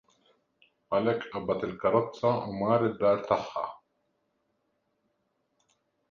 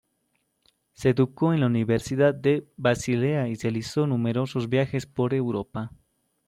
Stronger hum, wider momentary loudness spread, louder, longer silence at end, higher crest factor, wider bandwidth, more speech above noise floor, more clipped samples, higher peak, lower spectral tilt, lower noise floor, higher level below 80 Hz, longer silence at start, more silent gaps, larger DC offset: neither; about the same, 7 LU vs 7 LU; second, -29 LUFS vs -25 LUFS; first, 2.35 s vs 0.6 s; about the same, 20 dB vs 16 dB; second, 7.2 kHz vs 13.5 kHz; about the same, 49 dB vs 49 dB; neither; about the same, -10 dBFS vs -8 dBFS; about the same, -7.5 dB/octave vs -7 dB/octave; first, -77 dBFS vs -73 dBFS; second, -64 dBFS vs -58 dBFS; about the same, 0.9 s vs 1 s; neither; neither